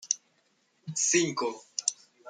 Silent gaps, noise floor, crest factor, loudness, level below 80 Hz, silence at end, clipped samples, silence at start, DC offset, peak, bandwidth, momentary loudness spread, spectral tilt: none; -71 dBFS; 24 dB; -29 LUFS; -84 dBFS; 0 s; under 0.1%; 0 s; under 0.1%; -8 dBFS; 10.5 kHz; 10 LU; -2 dB/octave